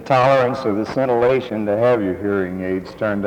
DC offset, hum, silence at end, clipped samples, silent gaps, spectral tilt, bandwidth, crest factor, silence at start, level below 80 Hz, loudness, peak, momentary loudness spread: under 0.1%; none; 0 s; under 0.1%; none; -7.5 dB/octave; 10.5 kHz; 16 dB; 0 s; -52 dBFS; -18 LUFS; -2 dBFS; 8 LU